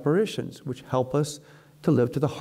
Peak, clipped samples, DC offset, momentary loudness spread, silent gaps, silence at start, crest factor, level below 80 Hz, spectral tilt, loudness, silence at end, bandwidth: -12 dBFS; under 0.1%; under 0.1%; 12 LU; none; 0 s; 14 dB; -60 dBFS; -7 dB/octave; -27 LUFS; 0 s; 15.5 kHz